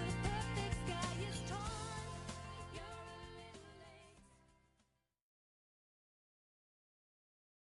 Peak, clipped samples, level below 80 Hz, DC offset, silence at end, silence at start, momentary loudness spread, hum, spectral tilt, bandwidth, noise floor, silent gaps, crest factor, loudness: -26 dBFS; under 0.1%; -56 dBFS; under 0.1%; 3.3 s; 0 s; 18 LU; none; -4.5 dB/octave; 11.5 kHz; -81 dBFS; none; 20 dB; -44 LUFS